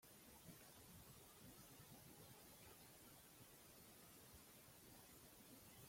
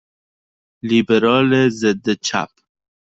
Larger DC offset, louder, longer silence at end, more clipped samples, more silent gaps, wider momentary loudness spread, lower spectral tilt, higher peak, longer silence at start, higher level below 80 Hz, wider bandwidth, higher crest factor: neither; second, -63 LUFS vs -17 LUFS; second, 0 s vs 0.55 s; neither; neither; second, 1 LU vs 11 LU; second, -3 dB/octave vs -5 dB/octave; second, -50 dBFS vs -2 dBFS; second, 0 s vs 0.85 s; second, -80 dBFS vs -58 dBFS; first, 16.5 kHz vs 8 kHz; about the same, 16 dB vs 16 dB